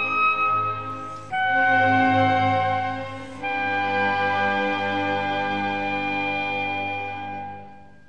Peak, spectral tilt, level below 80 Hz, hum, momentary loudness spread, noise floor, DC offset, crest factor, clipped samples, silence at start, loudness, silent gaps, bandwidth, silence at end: -8 dBFS; -6 dB/octave; -62 dBFS; none; 13 LU; -45 dBFS; 0.6%; 16 dB; under 0.1%; 0 s; -23 LUFS; none; 8.6 kHz; 0.2 s